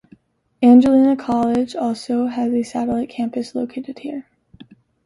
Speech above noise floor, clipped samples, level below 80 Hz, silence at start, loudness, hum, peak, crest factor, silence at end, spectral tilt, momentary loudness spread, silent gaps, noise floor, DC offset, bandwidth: 35 dB; under 0.1%; -56 dBFS; 0.6 s; -18 LUFS; none; -2 dBFS; 16 dB; 0.85 s; -6.5 dB/octave; 18 LU; none; -52 dBFS; under 0.1%; 11 kHz